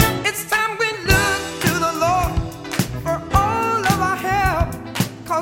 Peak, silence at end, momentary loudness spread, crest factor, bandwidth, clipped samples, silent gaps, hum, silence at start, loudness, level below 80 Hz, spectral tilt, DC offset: 0 dBFS; 0 s; 8 LU; 18 dB; 17 kHz; under 0.1%; none; none; 0 s; -19 LUFS; -32 dBFS; -4 dB/octave; under 0.1%